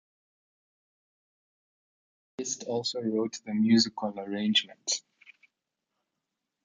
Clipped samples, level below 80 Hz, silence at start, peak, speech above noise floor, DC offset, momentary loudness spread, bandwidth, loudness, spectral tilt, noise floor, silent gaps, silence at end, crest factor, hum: under 0.1%; -78 dBFS; 2.4 s; -10 dBFS; 57 dB; under 0.1%; 11 LU; 9.4 kHz; -29 LUFS; -3.5 dB/octave; -85 dBFS; none; 1.65 s; 22 dB; none